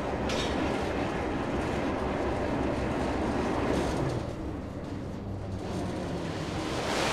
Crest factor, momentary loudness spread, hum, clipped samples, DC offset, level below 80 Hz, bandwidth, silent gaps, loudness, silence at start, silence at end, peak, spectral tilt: 16 dB; 8 LU; none; under 0.1%; under 0.1%; -42 dBFS; 14.5 kHz; none; -31 LUFS; 0 s; 0 s; -16 dBFS; -5.5 dB/octave